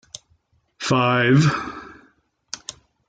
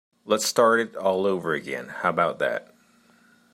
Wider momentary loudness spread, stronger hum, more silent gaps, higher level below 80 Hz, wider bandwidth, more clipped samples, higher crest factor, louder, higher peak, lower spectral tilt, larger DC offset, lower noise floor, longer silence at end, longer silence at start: first, 23 LU vs 9 LU; neither; neither; first, -56 dBFS vs -72 dBFS; second, 9.2 kHz vs 16 kHz; neither; about the same, 18 dB vs 20 dB; first, -19 LUFS vs -24 LUFS; about the same, -6 dBFS vs -6 dBFS; first, -5.5 dB/octave vs -3.5 dB/octave; neither; first, -63 dBFS vs -59 dBFS; second, 0.5 s vs 0.9 s; first, 0.8 s vs 0.25 s